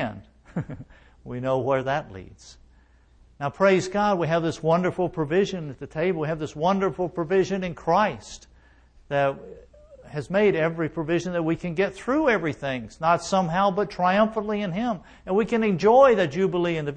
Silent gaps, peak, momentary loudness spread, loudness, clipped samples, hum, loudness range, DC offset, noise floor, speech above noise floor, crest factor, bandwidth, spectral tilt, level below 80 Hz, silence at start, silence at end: none; -4 dBFS; 13 LU; -24 LUFS; under 0.1%; none; 5 LU; under 0.1%; -56 dBFS; 33 dB; 20 dB; 9.4 kHz; -6.5 dB/octave; -52 dBFS; 0 s; 0 s